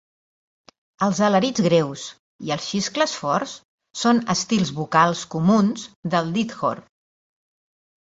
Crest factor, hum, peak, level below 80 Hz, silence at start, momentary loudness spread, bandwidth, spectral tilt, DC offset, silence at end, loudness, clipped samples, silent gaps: 20 dB; none; -2 dBFS; -62 dBFS; 1 s; 15 LU; 8 kHz; -5 dB/octave; under 0.1%; 1.3 s; -21 LUFS; under 0.1%; 2.19-2.39 s, 3.65-3.78 s, 5.96-6.03 s